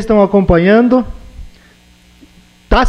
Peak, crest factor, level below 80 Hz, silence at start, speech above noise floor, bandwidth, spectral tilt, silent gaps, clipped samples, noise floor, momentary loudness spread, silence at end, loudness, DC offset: 0 dBFS; 12 dB; -24 dBFS; 0 s; 36 dB; 10.5 kHz; -7.5 dB/octave; none; under 0.1%; -45 dBFS; 7 LU; 0 s; -10 LUFS; under 0.1%